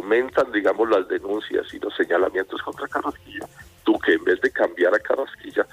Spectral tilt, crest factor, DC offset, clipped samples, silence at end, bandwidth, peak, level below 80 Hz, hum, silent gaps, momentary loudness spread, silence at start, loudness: -5 dB/octave; 16 dB; under 0.1%; under 0.1%; 0.1 s; 15.5 kHz; -8 dBFS; -58 dBFS; none; none; 11 LU; 0 s; -22 LUFS